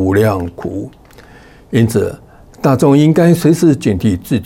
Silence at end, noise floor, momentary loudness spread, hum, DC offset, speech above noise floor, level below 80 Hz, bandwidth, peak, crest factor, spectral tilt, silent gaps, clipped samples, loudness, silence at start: 0 s; -40 dBFS; 14 LU; none; under 0.1%; 28 dB; -44 dBFS; 17 kHz; -2 dBFS; 12 dB; -7.5 dB/octave; none; under 0.1%; -13 LUFS; 0 s